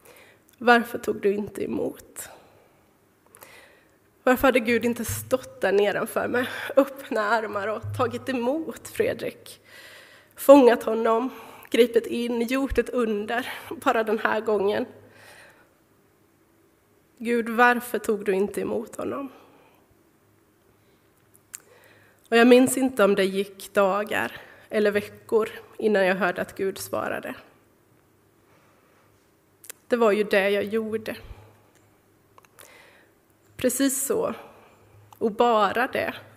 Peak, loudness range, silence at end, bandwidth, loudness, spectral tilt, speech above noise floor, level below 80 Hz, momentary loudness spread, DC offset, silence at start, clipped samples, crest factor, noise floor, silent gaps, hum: -2 dBFS; 10 LU; 0.15 s; 16.5 kHz; -24 LUFS; -4 dB/octave; 38 dB; -54 dBFS; 15 LU; under 0.1%; 0.6 s; under 0.1%; 24 dB; -61 dBFS; none; none